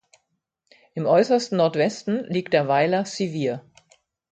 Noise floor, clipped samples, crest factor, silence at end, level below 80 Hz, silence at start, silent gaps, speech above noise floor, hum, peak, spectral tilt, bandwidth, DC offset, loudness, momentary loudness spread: -76 dBFS; under 0.1%; 18 dB; 0.7 s; -68 dBFS; 0.95 s; none; 54 dB; none; -4 dBFS; -5.5 dB/octave; 9.2 kHz; under 0.1%; -22 LUFS; 9 LU